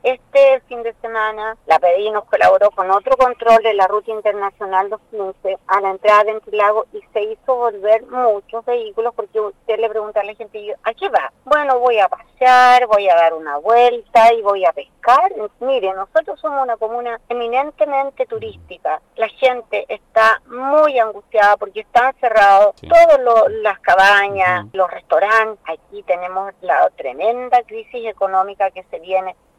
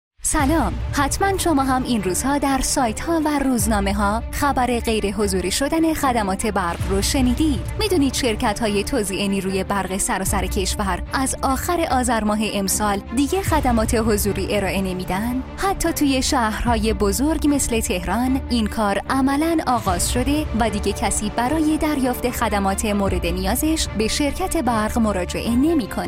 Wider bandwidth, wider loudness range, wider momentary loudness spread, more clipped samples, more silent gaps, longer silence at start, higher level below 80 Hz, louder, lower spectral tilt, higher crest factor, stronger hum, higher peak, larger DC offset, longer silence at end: second, 12.5 kHz vs 16.5 kHz; first, 7 LU vs 1 LU; first, 12 LU vs 3 LU; neither; neither; second, 0.05 s vs 0.25 s; second, -54 dBFS vs -30 dBFS; first, -15 LUFS vs -20 LUFS; about the same, -3.5 dB/octave vs -4.5 dB/octave; about the same, 12 dB vs 14 dB; neither; about the same, -4 dBFS vs -6 dBFS; neither; first, 0.25 s vs 0 s